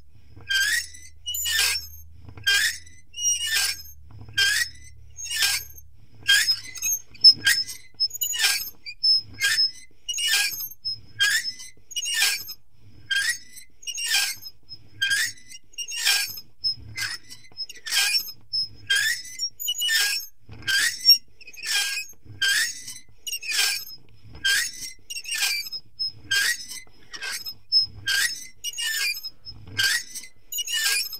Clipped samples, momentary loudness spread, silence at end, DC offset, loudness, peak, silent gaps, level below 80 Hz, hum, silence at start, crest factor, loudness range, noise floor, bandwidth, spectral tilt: under 0.1%; 17 LU; 0 s; 0.7%; -22 LUFS; -4 dBFS; none; -58 dBFS; none; 0.35 s; 24 dB; 6 LU; -53 dBFS; 16 kHz; 2.5 dB/octave